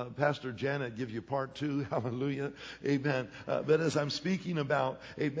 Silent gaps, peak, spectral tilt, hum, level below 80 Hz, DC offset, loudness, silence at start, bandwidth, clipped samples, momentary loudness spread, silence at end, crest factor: none; -14 dBFS; -6 dB/octave; none; -66 dBFS; under 0.1%; -33 LUFS; 0 s; 8 kHz; under 0.1%; 7 LU; 0 s; 20 dB